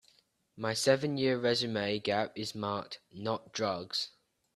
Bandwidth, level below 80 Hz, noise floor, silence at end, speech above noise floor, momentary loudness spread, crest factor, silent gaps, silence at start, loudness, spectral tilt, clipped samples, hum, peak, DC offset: 13 kHz; -72 dBFS; -69 dBFS; 0.45 s; 36 dB; 11 LU; 22 dB; none; 0.55 s; -33 LUFS; -4 dB/octave; under 0.1%; none; -12 dBFS; under 0.1%